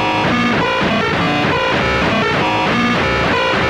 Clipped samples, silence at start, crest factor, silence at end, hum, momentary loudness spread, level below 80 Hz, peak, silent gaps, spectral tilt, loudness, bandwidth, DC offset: under 0.1%; 0 s; 10 dB; 0 s; none; 1 LU; -34 dBFS; -4 dBFS; none; -5 dB/octave; -14 LUFS; 15.5 kHz; under 0.1%